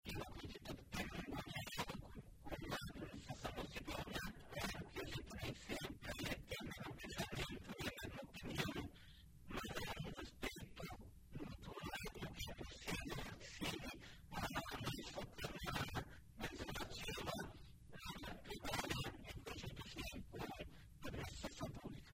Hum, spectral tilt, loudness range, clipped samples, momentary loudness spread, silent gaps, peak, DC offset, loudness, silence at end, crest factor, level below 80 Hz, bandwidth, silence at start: none; -4 dB/octave; 2 LU; under 0.1%; 8 LU; none; -26 dBFS; under 0.1%; -49 LUFS; 0 s; 24 dB; -60 dBFS; 16 kHz; 0.05 s